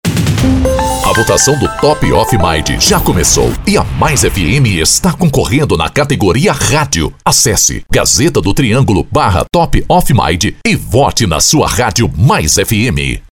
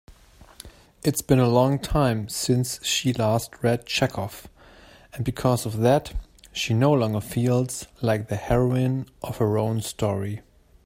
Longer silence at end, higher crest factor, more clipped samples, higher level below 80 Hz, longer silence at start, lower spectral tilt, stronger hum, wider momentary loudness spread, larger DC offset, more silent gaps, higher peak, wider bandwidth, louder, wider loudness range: second, 0.1 s vs 0.45 s; second, 10 dB vs 20 dB; neither; first, -22 dBFS vs -44 dBFS; about the same, 0.05 s vs 0.1 s; second, -4 dB/octave vs -5.5 dB/octave; neither; second, 4 LU vs 12 LU; first, 0.7% vs under 0.1%; neither; first, 0 dBFS vs -4 dBFS; first, 19.5 kHz vs 16 kHz; first, -10 LUFS vs -24 LUFS; about the same, 1 LU vs 3 LU